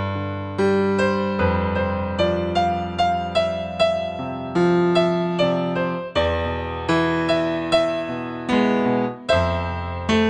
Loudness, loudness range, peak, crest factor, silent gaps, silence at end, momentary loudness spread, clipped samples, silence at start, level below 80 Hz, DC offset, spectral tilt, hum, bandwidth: -21 LUFS; 1 LU; -6 dBFS; 16 dB; none; 0 s; 7 LU; under 0.1%; 0 s; -46 dBFS; under 0.1%; -6.5 dB/octave; none; 10 kHz